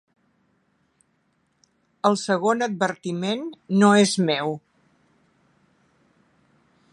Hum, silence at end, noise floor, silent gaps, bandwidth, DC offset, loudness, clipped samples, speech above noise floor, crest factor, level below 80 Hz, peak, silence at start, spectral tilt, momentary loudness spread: none; 2.35 s; -68 dBFS; none; 11.5 kHz; under 0.1%; -22 LUFS; under 0.1%; 47 dB; 22 dB; -74 dBFS; -4 dBFS; 2.05 s; -5 dB/octave; 12 LU